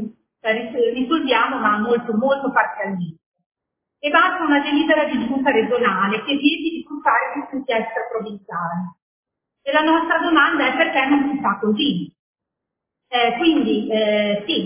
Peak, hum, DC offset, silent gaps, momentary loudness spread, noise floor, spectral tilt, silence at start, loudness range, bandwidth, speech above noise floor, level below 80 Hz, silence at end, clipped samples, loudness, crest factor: -2 dBFS; none; under 0.1%; 3.26-3.32 s, 3.46-3.50 s, 9.02-9.23 s, 12.19-12.34 s; 11 LU; -82 dBFS; -8.5 dB/octave; 0 s; 4 LU; 3.6 kHz; 63 dB; -60 dBFS; 0 s; under 0.1%; -19 LUFS; 18 dB